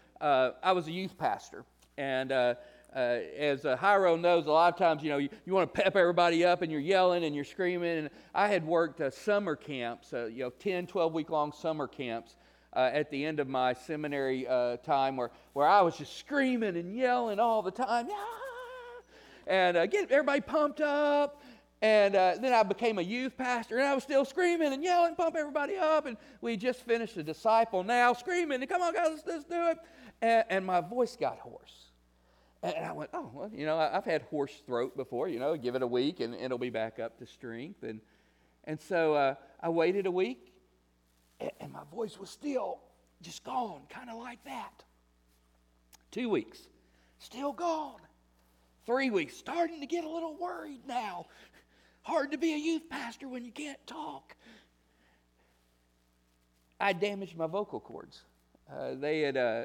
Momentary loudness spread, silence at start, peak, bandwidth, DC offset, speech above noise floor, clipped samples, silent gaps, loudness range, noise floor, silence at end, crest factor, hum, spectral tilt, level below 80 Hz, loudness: 17 LU; 0.2 s; -12 dBFS; 16 kHz; under 0.1%; 40 dB; under 0.1%; none; 12 LU; -71 dBFS; 0 s; 20 dB; none; -5 dB/octave; -70 dBFS; -31 LUFS